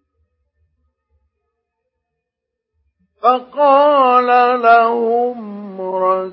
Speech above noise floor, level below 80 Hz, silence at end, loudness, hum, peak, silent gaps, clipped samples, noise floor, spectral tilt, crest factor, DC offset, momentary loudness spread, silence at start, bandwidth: 67 dB; -68 dBFS; 0 s; -13 LUFS; none; 0 dBFS; none; under 0.1%; -80 dBFS; -9.5 dB/octave; 16 dB; under 0.1%; 13 LU; 3.25 s; 5.8 kHz